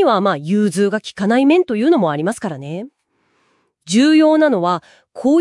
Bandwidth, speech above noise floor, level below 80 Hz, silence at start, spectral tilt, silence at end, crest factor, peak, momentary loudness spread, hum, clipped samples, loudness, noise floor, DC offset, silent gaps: 12 kHz; 48 dB; -66 dBFS; 0 s; -5.5 dB/octave; 0 s; 14 dB; -2 dBFS; 14 LU; none; under 0.1%; -15 LUFS; -63 dBFS; under 0.1%; none